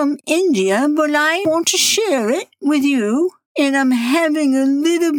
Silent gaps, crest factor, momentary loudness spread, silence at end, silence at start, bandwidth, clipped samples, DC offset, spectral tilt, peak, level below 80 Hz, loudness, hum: 3.46-3.55 s; 12 dB; 5 LU; 0 s; 0 s; 18 kHz; under 0.1%; under 0.1%; -2.5 dB/octave; -2 dBFS; -76 dBFS; -16 LUFS; none